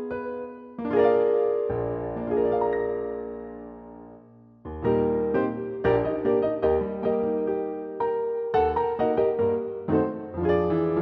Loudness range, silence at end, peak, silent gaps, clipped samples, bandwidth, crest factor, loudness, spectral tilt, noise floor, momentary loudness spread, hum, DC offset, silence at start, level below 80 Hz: 4 LU; 0 s; -10 dBFS; none; under 0.1%; 4.8 kHz; 16 dB; -25 LUFS; -10 dB/octave; -51 dBFS; 13 LU; none; under 0.1%; 0 s; -48 dBFS